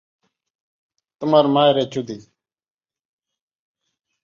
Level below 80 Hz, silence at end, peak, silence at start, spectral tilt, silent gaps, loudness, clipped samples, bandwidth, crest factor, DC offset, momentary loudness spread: -66 dBFS; 2.05 s; -4 dBFS; 1.2 s; -6.5 dB/octave; none; -18 LUFS; under 0.1%; 7.2 kHz; 20 dB; under 0.1%; 17 LU